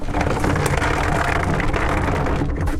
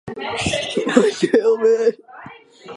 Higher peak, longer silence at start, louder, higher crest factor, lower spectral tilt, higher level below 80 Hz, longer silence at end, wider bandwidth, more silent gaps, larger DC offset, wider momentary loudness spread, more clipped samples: second, -4 dBFS vs 0 dBFS; about the same, 0 s vs 0.05 s; about the same, -20 LUFS vs -18 LUFS; about the same, 14 dB vs 18 dB; first, -6 dB/octave vs -4.5 dB/octave; first, -26 dBFS vs -48 dBFS; about the same, 0 s vs 0 s; first, 16 kHz vs 11.5 kHz; neither; neither; second, 2 LU vs 8 LU; neither